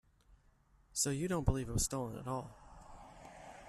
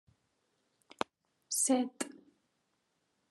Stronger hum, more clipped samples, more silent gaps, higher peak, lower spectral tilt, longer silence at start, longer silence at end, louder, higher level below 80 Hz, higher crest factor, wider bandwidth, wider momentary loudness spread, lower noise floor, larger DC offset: neither; neither; neither; second, -16 dBFS vs -12 dBFS; first, -4.5 dB/octave vs -1.5 dB/octave; second, 0.3 s vs 1.5 s; second, 0 s vs 1.15 s; second, -37 LUFS vs -34 LUFS; first, -48 dBFS vs -88 dBFS; about the same, 24 dB vs 26 dB; first, 14.5 kHz vs 12.5 kHz; first, 21 LU vs 13 LU; second, -69 dBFS vs -80 dBFS; neither